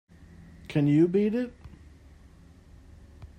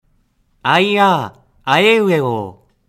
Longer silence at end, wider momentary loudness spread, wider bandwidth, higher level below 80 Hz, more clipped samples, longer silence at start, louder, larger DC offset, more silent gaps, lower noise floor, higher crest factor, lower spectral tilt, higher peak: second, 0.1 s vs 0.35 s; about the same, 15 LU vs 16 LU; second, 9.4 kHz vs 16 kHz; about the same, -54 dBFS vs -58 dBFS; neither; second, 0.4 s vs 0.65 s; second, -26 LUFS vs -14 LUFS; neither; neither; second, -53 dBFS vs -59 dBFS; about the same, 18 dB vs 16 dB; first, -9 dB/octave vs -5.5 dB/octave; second, -12 dBFS vs 0 dBFS